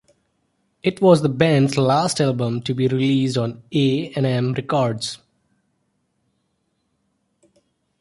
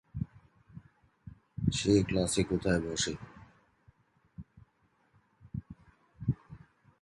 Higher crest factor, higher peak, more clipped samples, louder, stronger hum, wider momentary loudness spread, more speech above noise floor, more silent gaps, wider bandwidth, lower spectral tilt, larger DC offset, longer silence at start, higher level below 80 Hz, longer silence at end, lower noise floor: about the same, 18 dB vs 22 dB; first, -2 dBFS vs -14 dBFS; neither; first, -19 LUFS vs -32 LUFS; neither; second, 9 LU vs 27 LU; first, 52 dB vs 42 dB; neither; about the same, 11.5 kHz vs 11.5 kHz; about the same, -6 dB/octave vs -5 dB/octave; neither; first, 0.85 s vs 0.15 s; second, -58 dBFS vs -52 dBFS; first, 2.85 s vs 0.45 s; about the same, -70 dBFS vs -72 dBFS